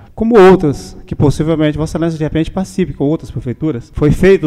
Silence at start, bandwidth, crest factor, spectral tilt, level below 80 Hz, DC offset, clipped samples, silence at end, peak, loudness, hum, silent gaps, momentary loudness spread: 0.15 s; 12.5 kHz; 12 dB; -7.5 dB/octave; -30 dBFS; under 0.1%; under 0.1%; 0 s; 0 dBFS; -13 LUFS; none; none; 12 LU